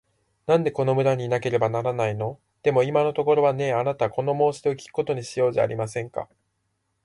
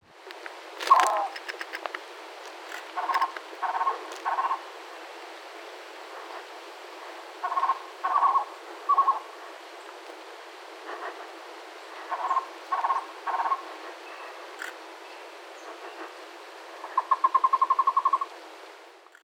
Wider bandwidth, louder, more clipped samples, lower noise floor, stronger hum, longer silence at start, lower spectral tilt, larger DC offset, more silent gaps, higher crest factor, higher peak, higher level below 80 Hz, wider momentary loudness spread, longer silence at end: second, 11.5 kHz vs 18 kHz; first, -24 LUFS vs -28 LUFS; neither; first, -74 dBFS vs -51 dBFS; neither; first, 0.45 s vs 0.1 s; first, -6.5 dB/octave vs 1 dB/octave; neither; neither; second, 16 dB vs 28 dB; second, -8 dBFS vs -4 dBFS; first, -62 dBFS vs under -90 dBFS; second, 10 LU vs 20 LU; first, 0.8 s vs 0.2 s